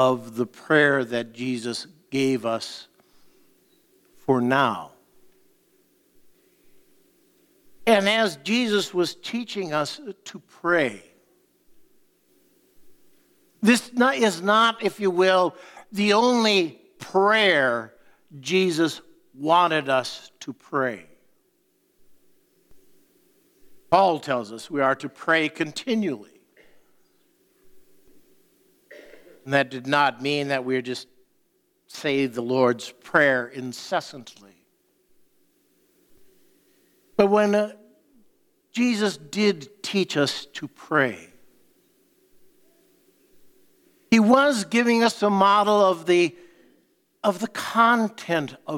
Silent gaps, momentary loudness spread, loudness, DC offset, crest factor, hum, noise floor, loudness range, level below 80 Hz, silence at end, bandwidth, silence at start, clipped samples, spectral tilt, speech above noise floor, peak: none; 15 LU; -22 LUFS; under 0.1%; 22 dB; none; -67 dBFS; 10 LU; -70 dBFS; 0 s; 17 kHz; 0 s; under 0.1%; -4.5 dB/octave; 45 dB; -2 dBFS